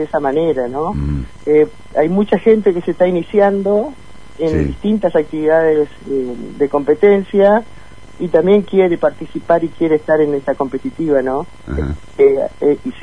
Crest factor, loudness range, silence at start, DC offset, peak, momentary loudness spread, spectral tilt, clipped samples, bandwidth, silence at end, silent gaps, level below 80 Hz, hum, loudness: 14 dB; 2 LU; 0 s; 2%; 0 dBFS; 9 LU; -8.5 dB/octave; under 0.1%; 10 kHz; 0 s; none; -34 dBFS; none; -15 LUFS